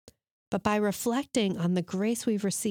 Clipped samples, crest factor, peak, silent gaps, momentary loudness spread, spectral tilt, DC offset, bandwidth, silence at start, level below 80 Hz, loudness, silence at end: under 0.1%; 16 dB; -12 dBFS; none; 3 LU; -5 dB/octave; under 0.1%; 19 kHz; 0.5 s; -64 dBFS; -29 LUFS; 0 s